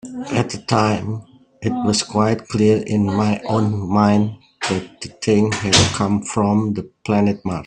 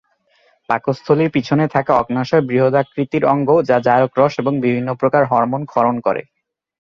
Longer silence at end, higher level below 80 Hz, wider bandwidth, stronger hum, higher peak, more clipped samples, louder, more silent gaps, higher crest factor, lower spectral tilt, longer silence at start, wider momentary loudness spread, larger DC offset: second, 0 s vs 0.6 s; first, -48 dBFS vs -56 dBFS; first, 10.5 kHz vs 7.2 kHz; neither; about the same, 0 dBFS vs -2 dBFS; neither; about the same, -18 LUFS vs -16 LUFS; neither; about the same, 18 dB vs 16 dB; second, -5 dB/octave vs -8 dB/octave; second, 0.05 s vs 0.7 s; first, 10 LU vs 6 LU; neither